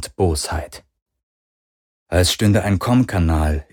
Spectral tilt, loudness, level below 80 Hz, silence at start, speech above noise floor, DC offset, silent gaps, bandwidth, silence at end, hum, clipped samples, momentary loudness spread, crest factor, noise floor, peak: -5.5 dB/octave; -18 LUFS; -30 dBFS; 0 s; over 72 dB; under 0.1%; 1.02-1.06 s, 1.23-2.06 s; 19 kHz; 0.1 s; none; under 0.1%; 9 LU; 18 dB; under -90 dBFS; -2 dBFS